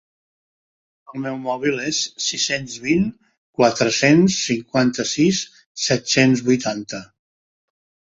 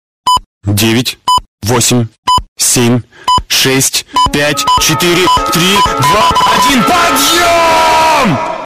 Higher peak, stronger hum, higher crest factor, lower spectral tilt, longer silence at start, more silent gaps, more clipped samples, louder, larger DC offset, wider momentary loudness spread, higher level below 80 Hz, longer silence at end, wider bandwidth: about the same, 0 dBFS vs 0 dBFS; neither; first, 20 dB vs 8 dB; about the same, -4 dB/octave vs -3 dB/octave; first, 1.1 s vs 0.25 s; second, 3.38-3.53 s, 5.66-5.75 s vs 0.46-0.61 s, 1.48-1.58 s, 2.18-2.23 s, 2.48-2.56 s; neither; second, -19 LUFS vs -9 LUFS; neither; first, 14 LU vs 5 LU; second, -56 dBFS vs -32 dBFS; first, 1.15 s vs 0 s; second, 8 kHz vs 15.5 kHz